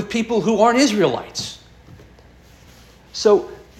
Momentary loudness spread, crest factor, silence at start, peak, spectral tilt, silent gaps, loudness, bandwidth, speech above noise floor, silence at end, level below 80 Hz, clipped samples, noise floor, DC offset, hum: 16 LU; 20 dB; 0 s; -2 dBFS; -4 dB/octave; none; -18 LUFS; 14 kHz; 30 dB; 0.2 s; -52 dBFS; under 0.1%; -47 dBFS; under 0.1%; none